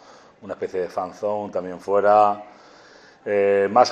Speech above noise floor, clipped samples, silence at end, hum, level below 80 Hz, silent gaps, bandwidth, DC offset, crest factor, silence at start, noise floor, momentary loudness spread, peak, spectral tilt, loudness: 29 dB; under 0.1%; 0 s; none; -72 dBFS; none; 8.8 kHz; under 0.1%; 20 dB; 0.45 s; -49 dBFS; 15 LU; -2 dBFS; -5 dB/octave; -21 LUFS